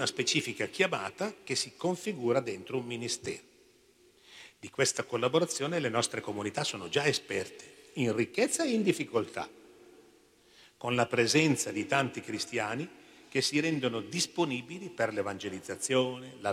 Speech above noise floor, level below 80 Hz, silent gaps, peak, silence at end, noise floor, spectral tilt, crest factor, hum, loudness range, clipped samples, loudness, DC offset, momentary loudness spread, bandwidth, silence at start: 32 dB; -74 dBFS; none; -12 dBFS; 0 s; -63 dBFS; -3.5 dB/octave; 20 dB; none; 4 LU; under 0.1%; -31 LUFS; under 0.1%; 11 LU; 16 kHz; 0 s